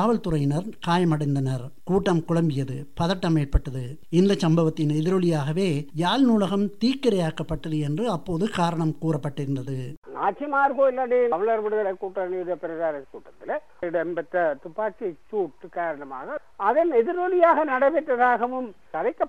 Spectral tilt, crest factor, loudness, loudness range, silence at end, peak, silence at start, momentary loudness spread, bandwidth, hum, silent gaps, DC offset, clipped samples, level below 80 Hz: -7 dB/octave; 18 dB; -24 LUFS; 6 LU; 0 s; -6 dBFS; 0 s; 11 LU; 12.5 kHz; none; 9.97-10.02 s; 1%; under 0.1%; -42 dBFS